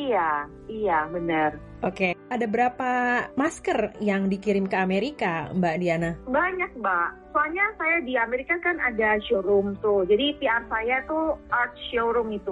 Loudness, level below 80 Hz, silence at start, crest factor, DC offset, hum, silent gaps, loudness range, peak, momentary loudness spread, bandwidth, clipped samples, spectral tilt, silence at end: -25 LUFS; -52 dBFS; 0 s; 14 dB; under 0.1%; none; none; 2 LU; -10 dBFS; 4 LU; 11.5 kHz; under 0.1%; -6 dB/octave; 0 s